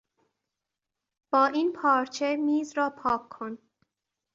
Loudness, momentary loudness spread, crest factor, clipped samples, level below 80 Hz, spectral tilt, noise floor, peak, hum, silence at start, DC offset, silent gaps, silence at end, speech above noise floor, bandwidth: -26 LUFS; 15 LU; 20 dB; under 0.1%; -70 dBFS; -4 dB/octave; -87 dBFS; -10 dBFS; none; 1.3 s; under 0.1%; none; 0.8 s; 60 dB; 7.8 kHz